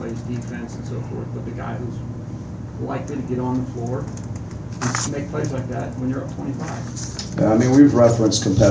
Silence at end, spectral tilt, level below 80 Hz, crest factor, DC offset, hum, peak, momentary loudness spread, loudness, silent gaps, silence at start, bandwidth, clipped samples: 0 s; -6 dB/octave; -40 dBFS; 20 dB; under 0.1%; none; 0 dBFS; 16 LU; -22 LUFS; none; 0 s; 8 kHz; under 0.1%